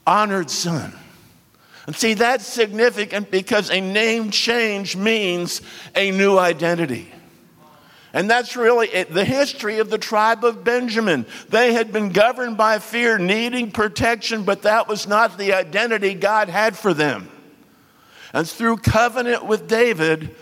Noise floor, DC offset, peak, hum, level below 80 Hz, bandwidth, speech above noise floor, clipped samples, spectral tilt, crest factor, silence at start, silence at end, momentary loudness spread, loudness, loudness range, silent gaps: -52 dBFS; under 0.1%; -2 dBFS; none; -48 dBFS; 16.5 kHz; 33 dB; under 0.1%; -4 dB/octave; 18 dB; 0.05 s; 0.1 s; 7 LU; -19 LUFS; 3 LU; none